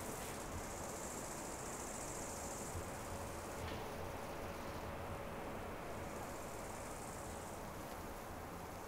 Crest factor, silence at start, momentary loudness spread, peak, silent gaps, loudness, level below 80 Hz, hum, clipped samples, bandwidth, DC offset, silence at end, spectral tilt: 14 dB; 0 s; 3 LU; -32 dBFS; none; -47 LUFS; -58 dBFS; none; under 0.1%; 16 kHz; under 0.1%; 0 s; -4 dB/octave